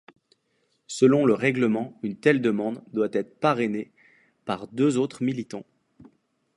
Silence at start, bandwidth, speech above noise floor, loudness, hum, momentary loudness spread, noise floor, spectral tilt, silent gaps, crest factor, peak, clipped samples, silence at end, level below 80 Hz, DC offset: 0.9 s; 11.5 kHz; 47 dB; -24 LUFS; none; 14 LU; -71 dBFS; -6 dB/octave; none; 20 dB; -6 dBFS; under 0.1%; 0.55 s; -70 dBFS; under 0.1%